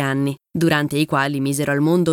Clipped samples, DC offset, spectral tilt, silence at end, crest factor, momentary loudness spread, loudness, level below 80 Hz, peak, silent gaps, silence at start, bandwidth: under 0.1%; under 0.1%; -5.5 dB/octave; 0 s; 14 dB; 4 LU; -19 LUFS; -56 dBFS; -4 dBFS; none; 0 s; 17.5 kHz